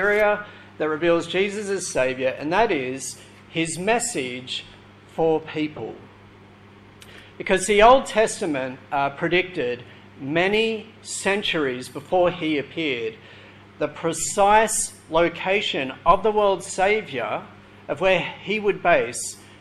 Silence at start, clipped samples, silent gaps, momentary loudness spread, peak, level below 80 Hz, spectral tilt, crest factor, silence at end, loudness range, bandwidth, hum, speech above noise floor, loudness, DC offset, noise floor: 0 s; under 0.1%; none; 13 LU; -2 dBFS; -48 dBFS; -3.5 dB/octave; 20 dB; 0.05 s; 6 LU; 14.5 kHz; none; 26 dB; -22 LUFS; under 0.1%; -48 dBFS